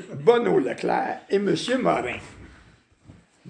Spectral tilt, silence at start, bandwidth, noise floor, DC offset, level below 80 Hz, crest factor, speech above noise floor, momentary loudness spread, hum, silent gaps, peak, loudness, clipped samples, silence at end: -5.5 dB/octave; 0 s; 10 kHz; -55 dBFS; under 0.1%; -58 dBFS; 22 dB; 33 dB; 10 LU; none; none; -4 dBFS; -23 LUFS; under 0.1%; 0 s